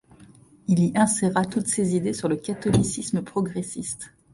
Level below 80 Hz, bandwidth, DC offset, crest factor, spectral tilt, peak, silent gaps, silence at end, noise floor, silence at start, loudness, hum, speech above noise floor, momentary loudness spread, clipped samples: -52 dBFS; 11.5 kHz; under 0.1%; 16 dB; -5.5 dB/octave; -8 dBFS; none; 0.25 s; -51 dBFS; 0.2 s; -24 LUFS; none; 28 dB; 11 LU; under 0.1%